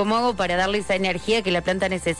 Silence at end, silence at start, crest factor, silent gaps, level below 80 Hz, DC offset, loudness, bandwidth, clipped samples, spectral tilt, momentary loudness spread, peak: 0 s; 0 s; 12 dB; none; -44 dBFS; under 0.1%; -22 LUFS; 11.5 kHz; under 0.1%; -4.5 dB/octave; 2 LU; -10 dBFS